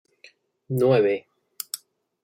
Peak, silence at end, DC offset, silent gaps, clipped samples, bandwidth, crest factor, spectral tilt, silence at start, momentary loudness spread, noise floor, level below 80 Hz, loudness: -6 dBFS; 0.45 s; under 0.1%; none; under 0.1%; 17 kHz; 20 dB; -6 dB/octave; 0.7 s; 16 LU; -56 dBFS; -74 dBFS; -24 LUFS